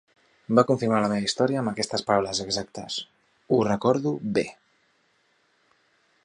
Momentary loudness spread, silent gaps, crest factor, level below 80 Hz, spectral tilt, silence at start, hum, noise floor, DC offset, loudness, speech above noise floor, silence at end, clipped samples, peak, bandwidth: 10 LU; none; 22 dB; -62 dBFS; -5 dB/octave; 0.5 s; none; -67 dBFS; under 0.1%; -25 LUFS; 43 dB; 1.75 s; under 0.1%; -4 dBFS; 11 kHz